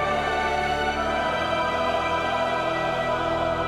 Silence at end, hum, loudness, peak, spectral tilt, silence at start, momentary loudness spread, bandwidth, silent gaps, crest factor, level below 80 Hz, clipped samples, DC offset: 0 s; none; -24 LUFS; -12 dBFS; -4.5 dB/octave; 0 s; 1 LU; 14 kHz; none; 12 dB; -42 dBFS; under 0.1%; under 0.1%